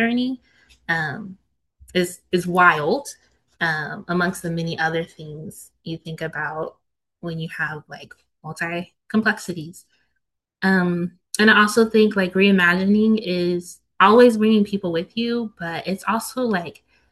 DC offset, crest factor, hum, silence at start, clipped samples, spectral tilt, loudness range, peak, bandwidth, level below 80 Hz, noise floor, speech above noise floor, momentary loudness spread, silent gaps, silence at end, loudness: under 0.1%; 20 dB; none; 0 s; under 0.1%; -5.5 dB/octave; 11 LU; 0 dBFS; 12.5 kHz; -60 dBFS; -76 dBFS; 56 dB; 21 LU; none; 0.4 s; -20 LUFS